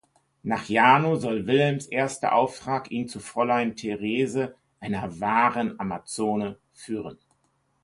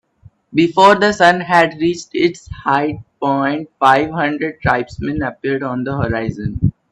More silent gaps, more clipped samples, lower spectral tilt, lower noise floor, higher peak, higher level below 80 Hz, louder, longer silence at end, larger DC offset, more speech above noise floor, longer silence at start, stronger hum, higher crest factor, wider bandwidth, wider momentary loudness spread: neither; neither; about the same, -5.5 dB/octave vs -6 dB/octave; first, -70 dBFS vs -48 dBFS; about the same, -2 dBFS vs 0 dBFS; second, -62 dBFS vs -40 dBFS; second, -25 LUFS vs -16 LUFS; first, 0.7 s vs 0.2 s; neither; first, 45 dB vs 33 dB; about the same, 0.45 s vs 0.5 s; neither; first, 22 dB vs 16 dB; about the same, 11.5 kHz vs 11.5 kHz; first, 14 LU vs 10 LU